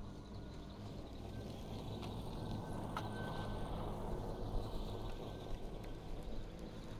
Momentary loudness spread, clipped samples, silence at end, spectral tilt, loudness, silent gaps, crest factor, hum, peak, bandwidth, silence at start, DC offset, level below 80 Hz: 6 LU; under 0.1%; 0 s; -6.5 dB/octave; -47 LUFS; none; 16 dB; none; -28 dBFS; 15 kHz; 0 s; under 0.1%; -48 dBFS